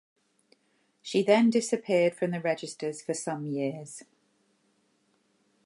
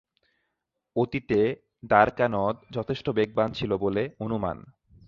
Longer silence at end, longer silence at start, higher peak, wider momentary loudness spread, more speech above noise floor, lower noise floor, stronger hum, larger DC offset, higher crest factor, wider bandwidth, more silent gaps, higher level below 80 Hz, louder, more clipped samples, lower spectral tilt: first, 1.65 s vs 0.35 s; about the same, 1.05 s vs 0.95 s; second, -10 dBFS vs -4 dBFS; first, 18 LU vs 12 LU; second, 44 dB vs 56 dB; second, -71 dBFS vs -82 dBFS; neither; neither; about the same, 22 dB vs 24 dB; first, 11.5 kHz vs 7 kHz; neither; second, -82 dBFS vs -54 dBFS; about the same, -28 LUFS vs -26 LUFS; neither; second, -5 dB/octave vs -8 dB/octave